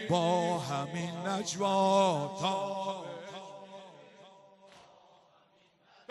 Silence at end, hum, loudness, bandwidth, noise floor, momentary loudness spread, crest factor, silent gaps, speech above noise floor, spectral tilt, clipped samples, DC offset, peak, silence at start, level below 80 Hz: 1.3 s; none; -31 LUFS; 13 kHz; -66 dBFS; 21 LU; 20 dB; none; 36 dB; -5 dB/octave; under 0.1%; under 0.1%; -14 dBFS; 0 s; -76 dBFS